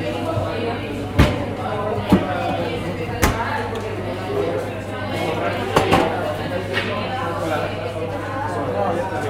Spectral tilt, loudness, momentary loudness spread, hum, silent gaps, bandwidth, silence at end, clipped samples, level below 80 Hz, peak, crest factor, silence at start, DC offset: -6 dB/octave; -22 LUFS; 8 LU; none; none; 16.5 kHz; 0 s; under 0.1%; -36 dBFS; 0 dBFS; 22 dB; 0 s; under 0.1%